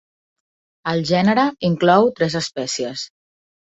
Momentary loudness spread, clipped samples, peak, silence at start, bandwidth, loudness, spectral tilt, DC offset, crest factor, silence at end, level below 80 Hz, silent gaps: 13 LU; under 0.1%; -2 dBFS; 0.85 s; 8.4 kHz; -18 LUFS; -5 dB/octave; under 0.1%; 18 dB; 0.55 s; -58 dBFS; none